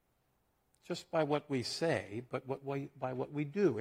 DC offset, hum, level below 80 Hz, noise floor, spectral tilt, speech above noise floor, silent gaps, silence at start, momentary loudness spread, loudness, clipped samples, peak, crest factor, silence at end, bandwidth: under 0.1%; none; -76 dBFS; -77 dBFS; -6 dB/octave; 41 dB; none; 0.9 s; 9 LU; -37 LUFS; under 0.1%; -18 dBFS; 18 dB; 0 s; 15.5 kHz